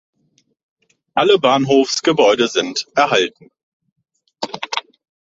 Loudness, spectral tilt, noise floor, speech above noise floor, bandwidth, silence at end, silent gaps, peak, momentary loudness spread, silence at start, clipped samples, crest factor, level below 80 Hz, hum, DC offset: -16 LUFS; -3.5 dB/octave; -62 dBFS; 47 dB; 7.8 kHz; 0.45 s; 3.63-3.80 s, 3.92-3.96 s; 0 dBFS; 12 LU; 1.15 s; under 0.1%; 18 dB; -62 dBFS; none; under 0.1%